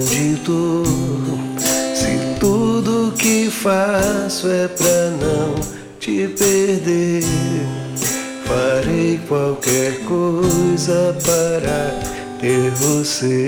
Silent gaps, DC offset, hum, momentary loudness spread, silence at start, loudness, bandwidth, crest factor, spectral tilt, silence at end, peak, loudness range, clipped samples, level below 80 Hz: none; under 0.1%; none; 6 LU; 0 s; -17 LUFS; 19.5 kHz; 14 dB; -4.5 dB/octave; 0 s; -2 dBFS; 2 LU; under 0.1%; -40 dBFS